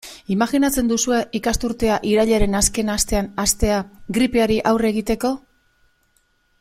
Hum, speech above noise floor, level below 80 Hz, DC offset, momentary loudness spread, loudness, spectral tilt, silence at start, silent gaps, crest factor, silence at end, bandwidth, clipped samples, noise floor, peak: none; 44 dB; -34 dBFS; under 0.1%; 5 LU; -19 LUFS; -4 dB/octave; 0.05 s; none; 18 dB; 1.25 s; 16 kHz; under 0.1%; -63 dBFS; -2 dBFS